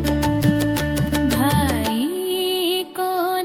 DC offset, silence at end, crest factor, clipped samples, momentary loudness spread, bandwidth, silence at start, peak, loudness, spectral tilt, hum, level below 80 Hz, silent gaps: under 0.1%; 0 s; 16 dB; under 0.1%; 4 LU; 18 kHz; 0 s; -4 dBFS; -20 LUFS; -5 dB/octave; none; -36 dBFS; none